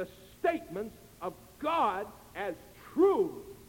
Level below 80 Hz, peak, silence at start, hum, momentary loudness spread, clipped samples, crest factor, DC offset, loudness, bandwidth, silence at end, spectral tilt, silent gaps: -62 dBFS; -14 dBFS; 0 s; none; 16 LU; under 0.1%; 18 dB; under 0.1%; -32 LUFS; 17 kHz; 0.05 s; -5.5 dB/octave; none